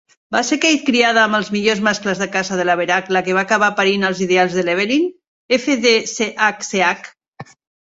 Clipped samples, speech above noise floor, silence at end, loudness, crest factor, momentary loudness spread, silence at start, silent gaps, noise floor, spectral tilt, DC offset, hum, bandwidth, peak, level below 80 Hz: under 0.1%; 23 dB; 0.5 s; -16 LUFS; 18 dB; 6 LU; 0.3 s; 5.28-5.49 s, 7.28-7.32 s; -40 dBFS; -3.5 dB/octave; under 0.1%; none; 8 kHz; 0 dBFS; -60 dBFS